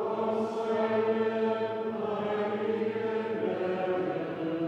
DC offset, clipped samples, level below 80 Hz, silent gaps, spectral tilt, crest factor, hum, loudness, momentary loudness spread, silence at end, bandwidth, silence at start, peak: under 0.1%; under 0.1%; -78 dBFS; none; -7.5 dB/octave; 14 dB; none; -30 LUFS; 5 LU; 0 s; 7.8 kHz; 0 s; -16 dBFS